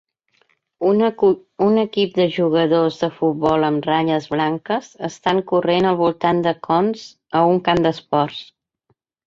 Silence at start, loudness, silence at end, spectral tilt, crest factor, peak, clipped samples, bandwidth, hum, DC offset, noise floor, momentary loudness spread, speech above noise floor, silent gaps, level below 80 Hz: 0.8 s; -18 LUFS; 0.85 s; -7 dB/octave; 16 dB; -2 dBFS; under 0.1%; 7.6 kHz; none; under 0.1%; -67 dBFS; 7 LU; 49 dB; none; -56 dBFS